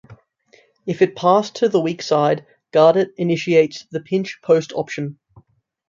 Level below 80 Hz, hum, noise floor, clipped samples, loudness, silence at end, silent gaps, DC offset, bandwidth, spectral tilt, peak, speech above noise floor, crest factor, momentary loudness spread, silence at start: -66 dBFS; none; -55 dBFS; under 0.1%; -18 LUFS; 0.75 s; none; under 0.1%; 7.6 kHz; -6 dB/octave; -2 dBFS; 38 dB; 16 dB; 13 LU; 0.1 s